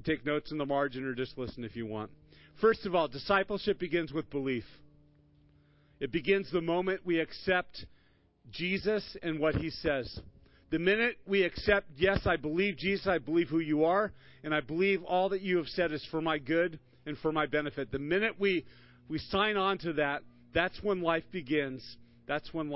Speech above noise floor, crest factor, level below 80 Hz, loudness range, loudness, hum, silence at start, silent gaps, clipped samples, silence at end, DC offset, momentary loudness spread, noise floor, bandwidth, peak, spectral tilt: 35 dB; 20 dB; -54 dBFS; 4 LU; -32 LUFS; none; 0 s; none; under 0.1%; 0 s; under 0.1%; 11 LU; -66 dBFS; 5.8 kHz; -12 dBFS; -9.5 dB/octave